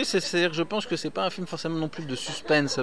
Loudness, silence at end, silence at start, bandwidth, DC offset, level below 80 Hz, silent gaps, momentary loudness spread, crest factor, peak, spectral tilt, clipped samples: -27 LUFS; 0 s; 0 s; 11 kHz; 0.6%; -62 dBFS; none; 8 LU; 18 dB; -10 dBFS; -4 dB/octave; under 0.1%